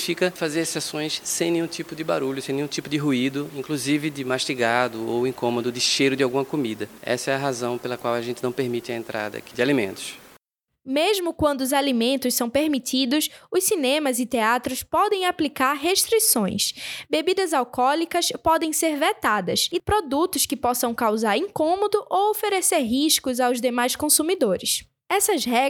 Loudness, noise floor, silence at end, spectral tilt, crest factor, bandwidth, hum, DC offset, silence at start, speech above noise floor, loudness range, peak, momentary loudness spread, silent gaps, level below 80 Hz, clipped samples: -22 LUFS; -64 dBFS; 0 s; -3 dB/octave; 18 dB; over 20 kHz; none; under 0.1%; 0 s; 41 dB; 5 LU; -4 dBFS; 7 LU; none; -56 dBFS; under 0.1%